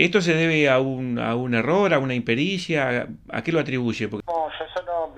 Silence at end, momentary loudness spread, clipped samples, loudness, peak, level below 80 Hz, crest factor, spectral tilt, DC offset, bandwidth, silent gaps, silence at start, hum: 0 s; 10 LU; under 0.1%; -22 LUFS; -2 dBFS; -54 dBFS; 20 dB; -6 dB/octave; under 0.1%; 10 kHz; none; 0 s; none